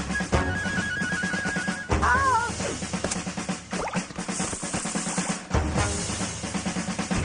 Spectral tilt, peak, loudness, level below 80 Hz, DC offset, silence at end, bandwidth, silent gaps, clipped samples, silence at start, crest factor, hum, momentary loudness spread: -4 dB/octave; -8 dBFS; -27 LUFS; -40 dBFS; under 0.1%; 0 s; 10 kHz; none; under 0.1%; 0 s; 18 dB; none; 7 LU